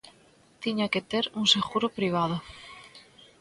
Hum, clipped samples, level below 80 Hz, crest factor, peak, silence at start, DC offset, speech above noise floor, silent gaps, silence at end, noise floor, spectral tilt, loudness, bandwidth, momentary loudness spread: none; under 0.1%; -62 dBFS; 22 dB; -8 dBFS; 0.05 s; under 0.1%; 32 dB; none; 0.4 s; -59 dBFS; -4 dB/octave; -27 LUFS; 11.5 kHz; 22 LU